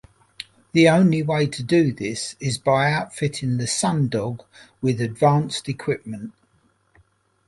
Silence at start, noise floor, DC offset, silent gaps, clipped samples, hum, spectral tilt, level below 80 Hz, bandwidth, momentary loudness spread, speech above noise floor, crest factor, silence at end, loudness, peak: 0.4 s; -63 dBFS; under 0.1%; none; under 0.1%; none; -5.5 dB/octave; -56 dBFS; 11.5 kHz; 17 LU; 42 dB; 20 dB; 1.15 s; -21 LUFS; -2 dBFS